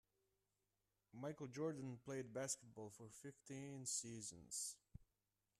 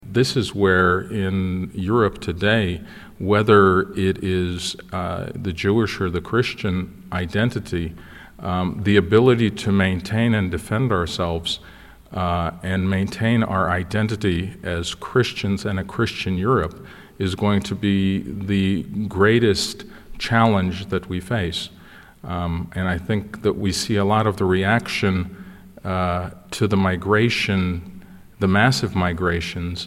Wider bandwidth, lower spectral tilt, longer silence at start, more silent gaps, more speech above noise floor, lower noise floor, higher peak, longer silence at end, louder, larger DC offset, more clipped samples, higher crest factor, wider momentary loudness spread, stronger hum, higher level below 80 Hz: about the same, 14 kHz vs 15 kHz; second, -3.5 dB/octave vs -6 dB/octave; first, 1.15 s vs 0.05 s; neither; first, over 39 dB vs 21 dB; first, under -90 dBFS vs -41 dBFS; second, -32 dBFS vs -2 dBFS; first, 0.55 s vs 0 s; second, -50 LUFS vs -21 LUFS; neither; neither; about the same, 20 dB vs 18 dB; first, 13 LU vs 10 LU; first, 50 Hz at -80 dBFS vs none; second, -80 dBFS vs -42 dBFS